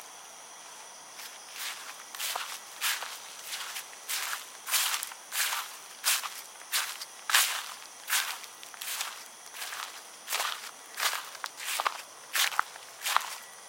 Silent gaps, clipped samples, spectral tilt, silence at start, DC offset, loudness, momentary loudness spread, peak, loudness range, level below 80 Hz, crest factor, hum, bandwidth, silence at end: none; under 0.1%; 4 dB/octave; 0 s; under 0.1%; -32 LUFS; 16 LU; -4 dBFS; 6 LU; under -90 dBFS; 32 dB; none; 17 kHz; 0 s